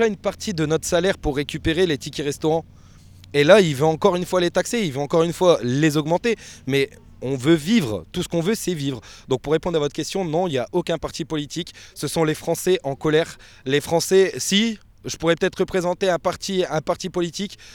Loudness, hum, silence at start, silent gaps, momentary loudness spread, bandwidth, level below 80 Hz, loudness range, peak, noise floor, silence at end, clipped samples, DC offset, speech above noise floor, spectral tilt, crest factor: -21 LUFS; none; 0 s; none; 9 LU; 18.5 kHz; -46 dBFS; 5 LU; 0 dBFS; -46 dBFS; 0 s; under 0.1%; under 0.1%; 25 dB; -5 dB/octave; 22 dB